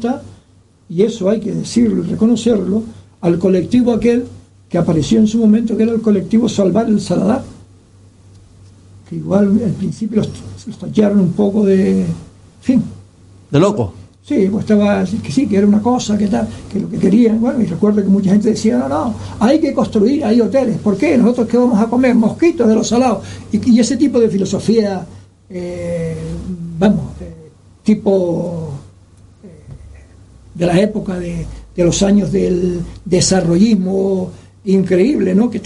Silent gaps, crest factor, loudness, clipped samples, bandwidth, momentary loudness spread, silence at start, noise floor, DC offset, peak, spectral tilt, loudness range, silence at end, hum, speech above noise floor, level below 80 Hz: none; 14 dB; -14 LUFS; under 0.1%; 11.5 kHz; 12 LU; 0 s; -49 dBFS; under 0.1%; 0 dBFS; -6.5 dB/octave; 6 LU; 0 s; none; 35 dB; -40 dBFS